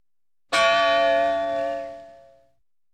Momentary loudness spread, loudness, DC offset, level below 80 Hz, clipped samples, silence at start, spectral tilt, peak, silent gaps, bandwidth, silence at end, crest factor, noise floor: 13 LU; -21 LUFS; under 0.1%; -58 dBFS; under 0.1%; 0.5 s; -2 dB/octave; -8 dBFS; none; 11.5 kHz; 0.8 s; 16 dB; -85 dBFS